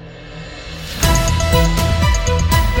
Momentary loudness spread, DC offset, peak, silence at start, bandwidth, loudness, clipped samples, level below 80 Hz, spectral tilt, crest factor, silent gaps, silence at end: 17 LU; under 0.1%; 0 dBFS; 0 s; over 20 kHz; -15 LUFS; under 0.1%; -20 dBFS; -4.5 dB/octave; 14 dB; none; 0 s